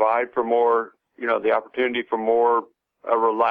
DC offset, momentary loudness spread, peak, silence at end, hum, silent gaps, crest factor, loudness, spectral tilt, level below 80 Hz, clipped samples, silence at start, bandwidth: under 0.1%; 6 LU; -6 dBFS; 0 s; none; none; 14 dB; -22 LUFS; -7 dB/octave; -70 dBFS; under 0.1%; 0 s; 4.3 kHz